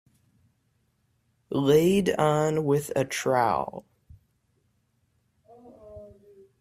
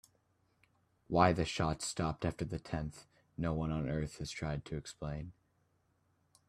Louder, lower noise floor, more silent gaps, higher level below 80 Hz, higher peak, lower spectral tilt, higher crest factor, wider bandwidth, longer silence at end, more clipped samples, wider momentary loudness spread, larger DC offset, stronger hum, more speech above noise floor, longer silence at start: first, -24 LUFS vs -37 LUFS; second, -71 dBFS vs -76 dBFS; neither; second, -60 dBFS vs -54 dBFS; first, -8 dBFS vs -12 dBFS; about the same, -6 dB/octave vs -5.5 dB/octave; second, 20 dB vs 26 dB; first, 15.5 kHz vs 14 kHz; second, 0.55 s vs 1.2 s; neither; first, 19 LU vs 14 LU; neither; neither; first, 47 dB vs 40 dB; first, 1.5 s vs 1.1 s